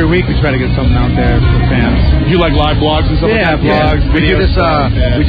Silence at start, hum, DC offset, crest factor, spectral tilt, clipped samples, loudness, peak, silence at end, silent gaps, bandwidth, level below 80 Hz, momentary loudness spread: 0 s; none; under 0.1%; 8 dB; -9.5 dB/octave; under 0.1%; -11 LUFS; 0 dBFS; 0 s; none; 5 kHz; -14 dBFS; 2 LU